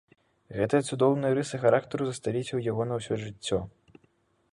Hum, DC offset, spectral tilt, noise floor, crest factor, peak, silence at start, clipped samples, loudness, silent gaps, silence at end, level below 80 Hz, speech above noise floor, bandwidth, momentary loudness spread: none; under 0.1%; -6 dB/octave; -68 dBFS; 20 dB; -10 dBFS; 0.5 s; under 0.1%; -28 LUFS; none; 0.85 s; -60 dBFS; 41 dB; 11.5 kHz; 8 LU